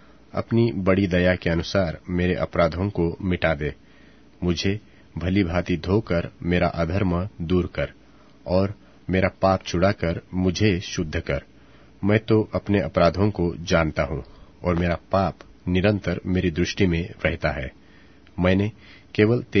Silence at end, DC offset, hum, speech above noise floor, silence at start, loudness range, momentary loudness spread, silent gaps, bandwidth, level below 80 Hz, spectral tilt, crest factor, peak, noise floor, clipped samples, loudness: 0 s; 0.2%; none; 29 dB; 0.35 s; 2 LU; 9 LU; none; 6.6 kHz; -40 dBFS; -7 dB/octave; 22 dB; -2 dBFS; -52 dBFS; under 0.1%; -23 LUFS